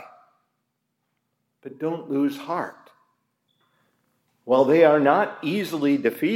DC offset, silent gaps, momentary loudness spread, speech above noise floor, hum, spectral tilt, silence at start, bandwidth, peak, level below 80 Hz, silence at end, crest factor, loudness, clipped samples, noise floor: under 0.1%; none; 14 LU; 56 dB; none; -6.5 dB/octave; 0 s; 16 kHz; -4 dBFS; -80 dBFS; 0 s; 20 dB; -22 LUFS; under 0.1%; -77 dBFS